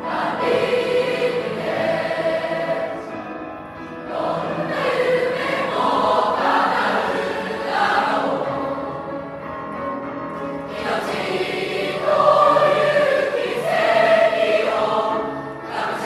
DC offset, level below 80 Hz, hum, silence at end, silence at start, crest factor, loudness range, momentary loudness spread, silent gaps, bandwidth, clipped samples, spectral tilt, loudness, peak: under 0.1%; -58 dBFS; none; 0 s; 0 s; 18 dB; 7 LU; 13 LU; none; 13 kHz; under 0.1%; -5 dB/octave; -20 LUFS; -2 dBFS